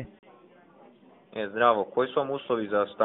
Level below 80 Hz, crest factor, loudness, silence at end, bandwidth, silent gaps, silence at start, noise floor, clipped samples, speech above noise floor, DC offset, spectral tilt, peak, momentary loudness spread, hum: -66 dBFS; 22 dB; -27 LUFS; 0 s; 4 kHz; none; 0 s; -55 dBFS; under 0.1%; 29 dB; under 0.1%; -3 dB/octave; -6 dBFS; 14 LU; none